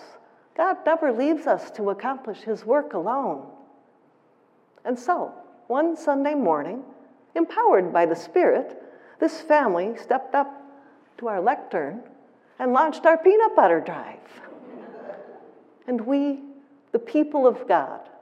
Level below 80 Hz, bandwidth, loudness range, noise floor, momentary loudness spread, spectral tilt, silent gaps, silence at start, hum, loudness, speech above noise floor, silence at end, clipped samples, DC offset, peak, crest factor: under -90 dBFS; 9.2 kHz; 7 LU; -60 dBFS; 19 LU; -6.5 dB/octave; none; 0 s; none; -23 LUFS; 38 dB; 0.15 s; under 0.1%; under 0.1%; -4 dBFS; 20 dB